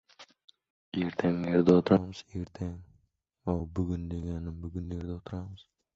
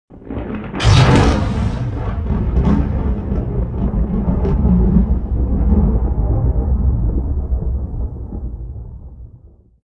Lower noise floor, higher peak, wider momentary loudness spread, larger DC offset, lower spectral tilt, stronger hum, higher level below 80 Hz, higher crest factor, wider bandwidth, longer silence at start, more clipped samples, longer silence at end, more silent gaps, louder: first, -71 dBFS vs -44 dBFS; second, -10 dBFS vs 0 dBFS; about the same, 17 LU vs 15 LU; neither; first, -8.5 dB/octave vs -7 dB/octave; neither; second, -46 dBFS vs -20 dBFS; first, 22 dB vs 16 dB; second, 7.6 kHz vs 10 kHz; about the same, 0.2 s vs 0.1 s; neither; about the same, 0.35 s vs 0.4 s; first, 0.44-0.48 s, 0.70-0.92 s vs none; second, -31 LUFS vs -17 LUFS